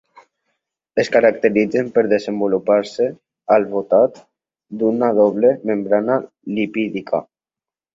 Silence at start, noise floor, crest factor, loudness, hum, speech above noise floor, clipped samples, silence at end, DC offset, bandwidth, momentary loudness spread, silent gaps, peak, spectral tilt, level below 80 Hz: 0.95 s; -90 dBFS; 18 dB; -18 LUFS; none; 73 dB; under 0.1%; 0.7 s; under 0.1%; 7.8 kHz; 9 LU; none; -2 dBFS; -6.5 dB/octave; -62 dBFS